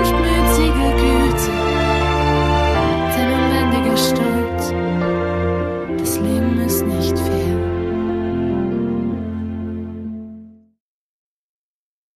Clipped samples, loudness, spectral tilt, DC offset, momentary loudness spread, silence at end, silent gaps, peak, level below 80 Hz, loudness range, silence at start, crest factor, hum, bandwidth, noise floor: under 0.1%; -18 LUFS; -5.5 dB/octave; under 0.1%; 10 LU; 1.65 s; none; -2 dBFS; -26 dBFS; 8 LU; 0 s; 16 dB; none; 15 kHz; -40 dBFS